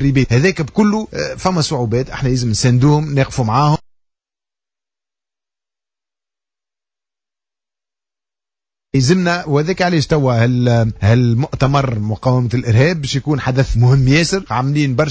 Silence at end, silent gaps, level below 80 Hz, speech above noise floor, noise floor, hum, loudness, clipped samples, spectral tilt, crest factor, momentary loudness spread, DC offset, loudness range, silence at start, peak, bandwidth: 0 s; none; -36 dBFS; over 76 dB; under -90 dBFS; none; -15 LUFS; under 0.1%; -6 dB/octave; 14 dB; 6 LU; under 0.1%; 7 LU; 0 s; -2 dBFS; 8 kHz